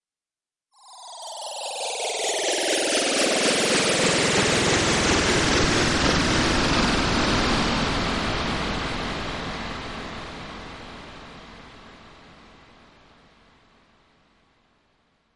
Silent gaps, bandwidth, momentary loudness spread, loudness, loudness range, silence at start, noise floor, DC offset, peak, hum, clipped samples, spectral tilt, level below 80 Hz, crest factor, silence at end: none; 11.5 kHz; 19 LU; -22 LUFS; 17 LU; 0.85 s; under -90 dBFS; under 0.1%; -6 dBFS; none; under 0.1%; -3 dB/octave; -38 dBFS; 18 dB; 3.05 s